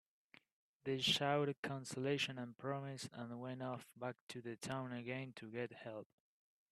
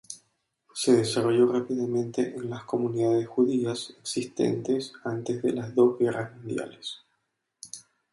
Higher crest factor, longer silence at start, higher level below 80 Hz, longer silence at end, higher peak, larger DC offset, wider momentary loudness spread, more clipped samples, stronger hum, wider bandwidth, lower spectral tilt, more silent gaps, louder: about the same, 22 dB vs 18 dB; first, 0.85 s vs 0.1 s; second, -82 dBFS vs -70 dBFS; first, 0.7 s vs 0.3 s; second, -22 dBFS vs -8 dBFS; neither; second, 14 LU vs 19 LU; neither; neither; first, 13 kHz vs 11.5 kHz; about the same, -4.5 dB/octave vs -5.5 dB/octave; first, 1.58-1.63 s, 4.21-4.27 s vs none; second, -43 LUFS vs -27 LUFS